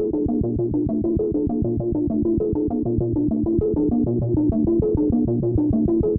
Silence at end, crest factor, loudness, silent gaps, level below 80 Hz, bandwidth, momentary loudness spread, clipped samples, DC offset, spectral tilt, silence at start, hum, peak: 0 s; 12 dB; -21 LUFS; none; -34 dBFS; 1.5 kHz; 3 LU; under 0.1%; under 0.1%; -16 dB/octave; 0 s; none; -8 dBFS